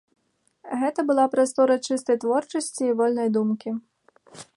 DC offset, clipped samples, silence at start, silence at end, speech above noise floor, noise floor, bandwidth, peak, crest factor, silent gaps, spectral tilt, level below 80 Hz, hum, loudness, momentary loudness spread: under 0.1%; under 0.1%; 0.65 s; 0.15 s; 35 dB; -57 dBFS; 11.5 kHz; -8 dBFS; 16 dB; none; -4.5 dB/octave; -78 dBFS; none; -23 LUFS; 9 LU